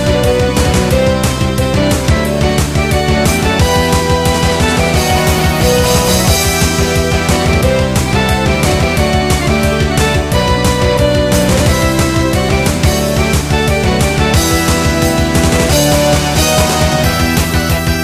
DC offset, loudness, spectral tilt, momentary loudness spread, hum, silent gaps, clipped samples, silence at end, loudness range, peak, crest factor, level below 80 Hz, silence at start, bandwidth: under 0.1%; -11 LUFS; -4.5 dB/octave; 3 LU; none; none; under 0.1%; 0 s; 1 LU; 0 dBFS; 10 dB; -20 dBFS; 0 s; 15.5 kHz